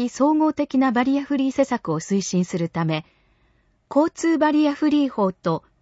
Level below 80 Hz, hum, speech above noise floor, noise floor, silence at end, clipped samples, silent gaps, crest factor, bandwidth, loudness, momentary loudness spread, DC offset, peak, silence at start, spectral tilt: -60 dBFS; none; 42 dB; -62 dBFS; 0.2 s; under 0.1%; none; 14 dB; 8 kHz; -21 LUFS; 6 LU; under 0.1%; -6 dBFS; 0 s; -6 dB/octave